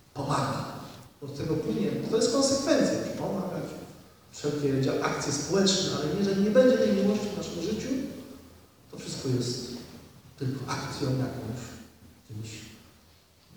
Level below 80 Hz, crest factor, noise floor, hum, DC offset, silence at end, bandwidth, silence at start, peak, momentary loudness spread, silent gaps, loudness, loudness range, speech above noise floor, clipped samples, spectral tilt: -58 dBFS; 20 dB; -59 dBFS; none; under 0.1%; 0.8 s; over 20 kHz; 0.15 s; -10 dBFS; 20 LU; none; -28 LUFS; 10 LU; 31 dB; under 0.1%; -5 dB/octave